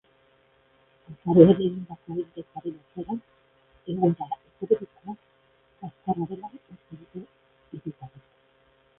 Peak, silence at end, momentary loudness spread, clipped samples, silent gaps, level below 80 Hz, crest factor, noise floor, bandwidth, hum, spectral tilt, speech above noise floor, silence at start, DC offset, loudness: -2 dBFS; 0.9 s; 26 LU; under 0.1%; none; -62 dBFS; 26 dB; -63 dBFS; 3.8 kHz; none; -12.5 dB/octave; 38 dB; 1.1 s; under 0.1%; -25 LUFS